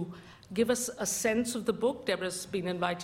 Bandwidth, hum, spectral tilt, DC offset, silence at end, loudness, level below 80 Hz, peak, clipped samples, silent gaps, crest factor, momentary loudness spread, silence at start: 16.5 kHz; none; -3.5 dB/octave; under 0.1%; 0 s; -31 LUFS; -64 dBFS; -14 dBFS; under 0.1%; none; 18 dB; 7 LU; 0 s